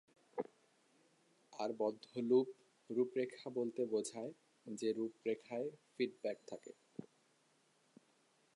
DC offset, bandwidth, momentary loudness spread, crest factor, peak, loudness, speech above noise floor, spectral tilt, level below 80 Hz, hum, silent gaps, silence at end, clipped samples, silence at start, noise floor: under 0.1%; 11 kHz; 18 LU; 20 dB; -22 dBFS; -41 LUFS; 35 dB; -5.5 dB/octave; under -90 dBFS; none; none; 1.5 s; under 0.1%; 0.35 s; -76 dBFS